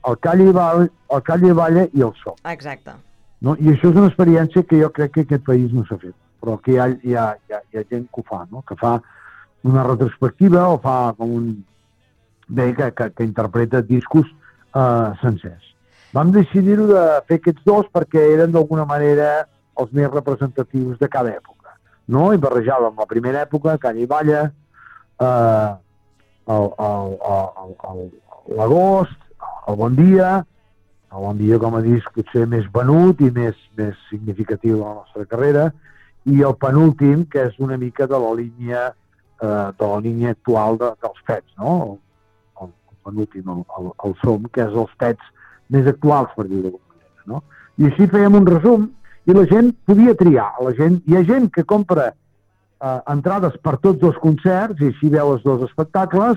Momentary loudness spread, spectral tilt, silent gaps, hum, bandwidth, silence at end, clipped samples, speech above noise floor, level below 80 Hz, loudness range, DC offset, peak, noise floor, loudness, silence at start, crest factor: 16 LU; -10.5 dB/octave; none; none; 7.2 kHz; 0 s; under 0.1%; 45 dB; -52 dBFS; 7 LU; under 0.1%; -4 dBFS; -61 dBFS; -16 LUFS; 0.05 s; 14 dB